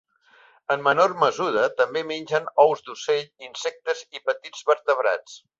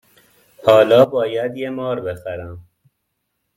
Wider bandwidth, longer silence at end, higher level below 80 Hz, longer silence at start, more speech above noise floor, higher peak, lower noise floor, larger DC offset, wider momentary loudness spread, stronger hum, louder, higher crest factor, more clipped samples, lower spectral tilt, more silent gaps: second, 7.8 kHz vs 14.5 kHz; second, 0.2 s vs 0.95 s; second, -72 dBFS vs -56 dBFS; about the same, 0.7 s vs 0.6 s; second, 33 dB vs 57 dB; about the same, -2 dBFS vs 0 dBFS; second, -56 dBFS vs -73 dBFS; neither; second, 11 LU vs 18 LU; neither; second, -23 LUFS vs -16 LUFS; about the same, 20 dB vs 18 dB; neither; second, -3.5 dB/octave vs -6.5 dB/octave; neither